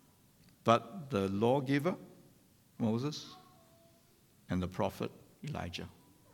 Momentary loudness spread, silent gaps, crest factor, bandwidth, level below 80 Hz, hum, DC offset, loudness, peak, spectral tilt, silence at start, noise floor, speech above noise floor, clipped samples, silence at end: 15 LU; none; 26 dB; 19 kHz; -66 dBFS; none; under 0.1%; -35 LUFS; -12 dBFS; -6.5 dB/octave; 0.65 s; -66 dBFS; 32 dB; under 0.1%; 0.45 s